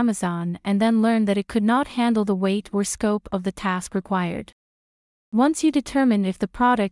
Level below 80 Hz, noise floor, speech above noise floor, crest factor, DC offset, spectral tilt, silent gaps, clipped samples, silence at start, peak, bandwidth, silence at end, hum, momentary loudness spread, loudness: -52 dBFS; under -90 dBFS; over 69 dB; 14 dB; under 0.1%; -5.5 dB/octave; 4.52-5.32 s; under 0.1%; 0 s; -8 dBFS; 12 kHz; 0 s; none; 7 LU; -22 LUFS